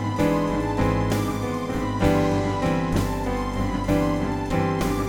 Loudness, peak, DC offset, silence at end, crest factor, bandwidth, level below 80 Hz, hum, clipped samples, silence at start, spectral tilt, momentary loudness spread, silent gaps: -24 LUFS; -8 dBFS; under 0.1%; 0 s; 16 dB; 19.5 kHz; -34 dBFS; none; under 0.1%; 0 s; -6.5 dB/octave; 5 LU; none